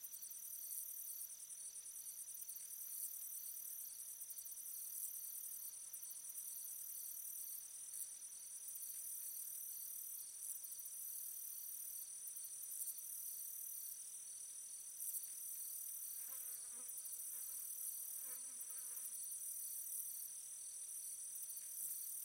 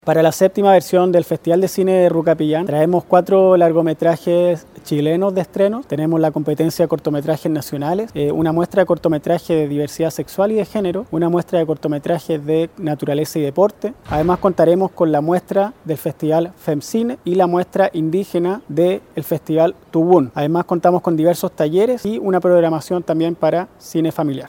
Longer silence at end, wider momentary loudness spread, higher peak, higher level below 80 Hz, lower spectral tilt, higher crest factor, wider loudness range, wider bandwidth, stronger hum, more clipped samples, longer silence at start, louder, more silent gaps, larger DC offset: about the same, 0 s vs 0 s; second, 4 LU vs 7 LU; second, -32 dBFS vs 0 dBFS; second, under -90 dBFS vs -50 dBFS; second, 2.5 dB/octave vs -7 dB/octave; about the same, 20 dB vs 16 dB; about the same, 2 LU vs 4 LU; about the same, 18 kHz vs 17 kHz; neither; neither; about the same, 0 s vs 0.05 s; second, -47 LUFS vs -17 LUFS; neither; neither